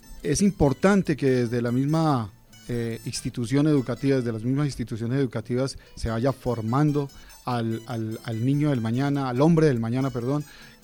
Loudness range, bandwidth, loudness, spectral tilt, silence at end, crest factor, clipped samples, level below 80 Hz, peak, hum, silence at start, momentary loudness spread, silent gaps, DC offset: 3 LU; 18 kHz; -25 LUFS; -7 dB/octave; 0.15 s; 18 dB; under 0.1%; -46 dBFS; -8 dBFS; none; 0.1 s; 10 LU; none; under 0.1%